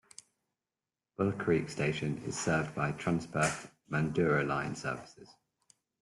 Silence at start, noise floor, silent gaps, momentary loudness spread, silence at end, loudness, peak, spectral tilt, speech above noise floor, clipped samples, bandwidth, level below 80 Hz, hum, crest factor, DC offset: 1.2 s; under -90 dBFS; none; 14 LU; 0.75 s; -33 LUFS; -16 dBFS; -5.5 dB/octave; over 57 dB; under 0.1%; 12 kHz; -62 dBFS; none; 18 dB; under 0.1%